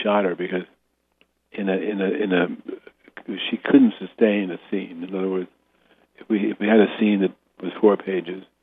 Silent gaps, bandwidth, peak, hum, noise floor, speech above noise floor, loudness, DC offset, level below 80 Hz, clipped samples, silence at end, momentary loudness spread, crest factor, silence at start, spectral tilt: none; 3.9 kHz; -2 dBFS; none; -65 dBFS; 44 dB; -22 LUFS; under 0.1%; -72 dBFS; under 0.1%; 0.2 s; 17 LU; 20 dB; 0 s; -9.5 dB/octave